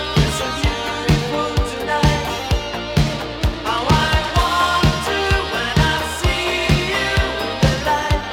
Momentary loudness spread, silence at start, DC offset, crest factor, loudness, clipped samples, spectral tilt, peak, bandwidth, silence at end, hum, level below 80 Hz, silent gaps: 5 LU; 0 s; under 0.1%; 16 dB; -18 LUFS; under 0.1%; -4.5 dB/octave; -2 dBFS; 17 kHz; 0 s; none; -26 dBFS; none